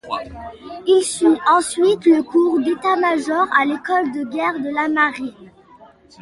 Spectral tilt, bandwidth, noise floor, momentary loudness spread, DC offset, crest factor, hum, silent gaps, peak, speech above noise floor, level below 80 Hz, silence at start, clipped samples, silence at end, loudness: -3.5 dB/octave; 11.5 kHz; -47 dBFS; 13 LU; under 0.1%; 16 dB; none; none; -2 dBFS; 29 dB; -54 dBFS; 0.05 s; under 0.1%; 0.75 s; -17 LUFS